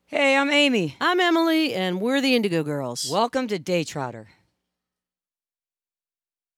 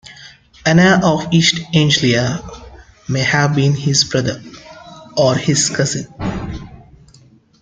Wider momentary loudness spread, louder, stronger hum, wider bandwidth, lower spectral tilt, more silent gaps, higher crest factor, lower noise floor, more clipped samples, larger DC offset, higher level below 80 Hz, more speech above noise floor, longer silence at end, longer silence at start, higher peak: second, 9 LU vs 16 LU; second, -22 LUFS vs -15 LUFS; neither; first, 17 kHz vs 9.4 kHz; about the same, -4 dB/octave vs -4.5 dB/octave; neither; about the same, 16 dB vs 16 dB; first, under -90 dBFS vs -48 dBFS; neither; neither; second, -72 dBFS vs -42 dBFS; first, over 67 dB vs 33 dB; first, 2.35 s vs 0.85 s; about the same, 0.1 s vs 0.1 s; second, -8 dBFS vs 0 dBFS